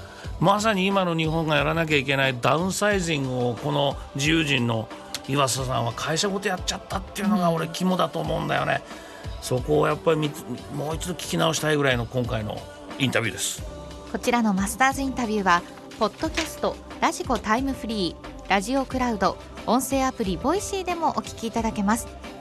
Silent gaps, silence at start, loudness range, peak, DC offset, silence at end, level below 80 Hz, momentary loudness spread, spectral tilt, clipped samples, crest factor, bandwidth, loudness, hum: none; 0 s; 3 LU; -6 dBFS; under 0.1%; 0 s; -44 dBFS; 10 LU; -4.5 dB/octave; under 0.1%; 18 dB; 13 kHz; -24 LUFS; none